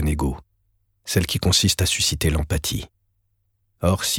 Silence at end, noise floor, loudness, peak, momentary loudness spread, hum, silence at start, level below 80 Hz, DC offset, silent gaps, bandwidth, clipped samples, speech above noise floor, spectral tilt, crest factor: 0 s; -69 dBFS; -21 LUFS; -4 dBFS; 15 LU; none; 0 s; -32 dBFS; under 0.1%; none; 18 kHz; under 0.1%; 48 dB; -3.5 dB/octave; 18 dB